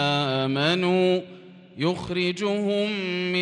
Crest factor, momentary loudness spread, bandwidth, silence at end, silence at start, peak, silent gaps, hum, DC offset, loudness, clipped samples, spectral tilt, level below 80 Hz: 16 dB; 6 LU; 10 kHz; 0 s; 0 s; -10 dBFS; none; none; under 0.1%; -24 LUFS; under 0.1%; -6 dB/octave; -62 dBFS